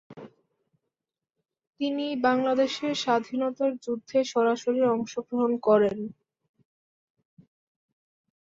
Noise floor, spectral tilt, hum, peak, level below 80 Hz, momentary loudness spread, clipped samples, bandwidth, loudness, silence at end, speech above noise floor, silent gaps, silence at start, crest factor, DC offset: -89 dBFS; -5 dB/octave; none; -8 dBFS; -72 dBFS; 9 LU; under 0.1%; 7.8 kHz; -26 LUFS; 2.35 s; 63 dB; 1.67-1.73 s; 0.1 s; 20 dB; under 0.1%